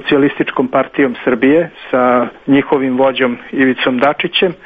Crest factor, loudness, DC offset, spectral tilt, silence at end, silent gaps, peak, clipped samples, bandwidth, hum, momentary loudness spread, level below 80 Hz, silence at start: 14 dB; -13 LUFS; under 0.1%; -8 dB/octave; 0.1 s; none; 0 dBFS; under 0.1%; 4.9 kHz; none; 3 LU; -50 dBFS; 0 s